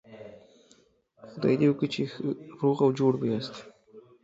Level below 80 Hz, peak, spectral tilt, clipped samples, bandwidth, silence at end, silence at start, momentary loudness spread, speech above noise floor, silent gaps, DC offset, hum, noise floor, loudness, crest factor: -68 dBFS; -12 dBFS; -7.5 dB/octave; under 0.1%; 7.8 kHz; 0.25 s; 0.1 s; 23 LU; 37 dB; none; under 0.1%; none; -63 dBFS; -27 LUFS; 18 dB